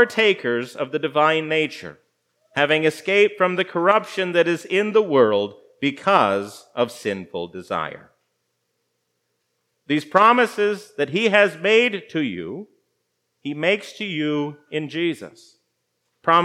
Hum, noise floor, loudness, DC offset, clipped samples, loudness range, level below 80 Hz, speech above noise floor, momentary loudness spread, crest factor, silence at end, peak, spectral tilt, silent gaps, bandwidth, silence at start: 60 Hz at -55 dBFS; -74 dBFS; -20 LUFS; under 0.1%; under 0.1%; 7 LU; -74 dBFS; 53 dB; 13 LU; 22 dB; 0 s; 0 dBFS; -5 dB/octave; none; 14 kHz; 0 s